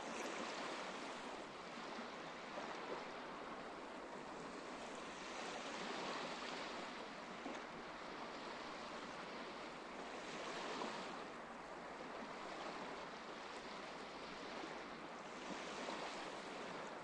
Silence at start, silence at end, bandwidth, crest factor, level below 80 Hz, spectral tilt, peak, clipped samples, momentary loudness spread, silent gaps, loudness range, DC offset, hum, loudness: 0 s; 0 s; 11 kHz; 16 dB; -76 dBFS; -3 dB/octave; -32 dBFS; under 0.1%; 5 LU; none; 2 LU; under 0.1%; none; -49 LUFS